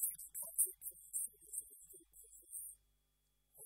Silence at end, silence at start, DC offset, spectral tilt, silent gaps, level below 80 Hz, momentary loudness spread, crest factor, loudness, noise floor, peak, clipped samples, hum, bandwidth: 0 s; 0 s; under 0.1%; 0 dB/octave; none; -80 dBFS; 22 LU; 28 dB; -42 LUFS; -81 dBFS; -20 dBFS; under 0.1%; none; 16 kHz